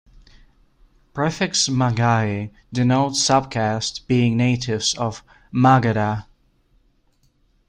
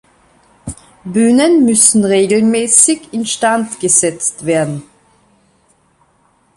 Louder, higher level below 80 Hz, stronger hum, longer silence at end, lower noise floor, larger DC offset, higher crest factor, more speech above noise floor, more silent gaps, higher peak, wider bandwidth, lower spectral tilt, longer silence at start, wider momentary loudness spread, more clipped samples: second, -20 LUFS vs -11 LUFS; about the same, -50 dBFS vs -50 dBFS; neither; second, 1.45 s vs 1.75 s; first, -61 dBFS vs -55 dBFS; neither; about the same, 18 dB vs 14 dB; about the same, 42 dB vs 43 dB; neither; second, -4 dBFS vs 0 dBFS; second, 10.5 kHz vs 14.5 kHz; about the same, -4.5 dB/octave vs -3.5 dB/octave; first, 1.15 s vs 0.65 s; second, 11 LU vs 21 LU; neither